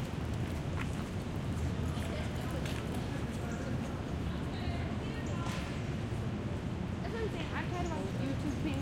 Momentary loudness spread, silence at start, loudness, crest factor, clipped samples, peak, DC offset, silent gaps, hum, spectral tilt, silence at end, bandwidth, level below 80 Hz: 2 LU; 0 s; -37 LUFS; 12 dB; under 0.1%; -22 dBFS; under 0.1%; none; none; -6.5 dB/octave; 0 s; 16.5 kHz; -44 dBFS